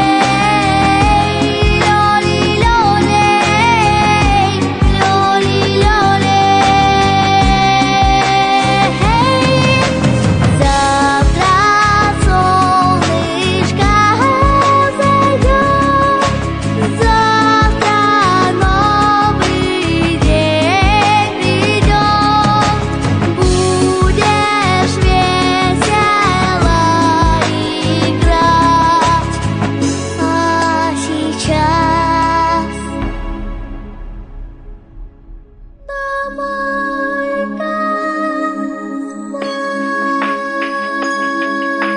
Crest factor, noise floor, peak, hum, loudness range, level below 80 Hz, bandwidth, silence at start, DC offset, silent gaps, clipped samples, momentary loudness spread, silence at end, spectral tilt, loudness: 12 dB; -37 dBFS; 0 dBFS; none; 8 LU; -22 dBFS; 10 kHz; 0 s; under 0.1%; none; under 0.1%; 8 LU; 0 s; -5 dB/octave; -12 LUFS